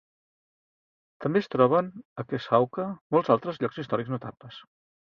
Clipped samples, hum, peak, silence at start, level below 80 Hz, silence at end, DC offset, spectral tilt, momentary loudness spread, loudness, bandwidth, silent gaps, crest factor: under 0.1%; none; -6 dBFS; 1.2 s; -68 dBFS; 0.55 s; under 0.1%; -8.5 dB/octave; 16 LU; -27 LUFS; 6.8 kHz; 2.05-2.16 s, 3.01-3.10 s; 22 dB